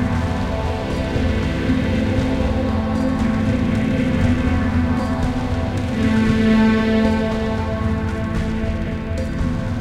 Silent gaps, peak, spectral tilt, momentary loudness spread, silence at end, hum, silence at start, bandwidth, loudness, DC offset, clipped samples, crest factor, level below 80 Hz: none; -4 dBFS; -7.5 dB/octave; 7 LU; 0 s; none; 0 s; 11 kHz; -20 LUFS; under 0.1%; under 0.1%; 14 dB; -28 dBFS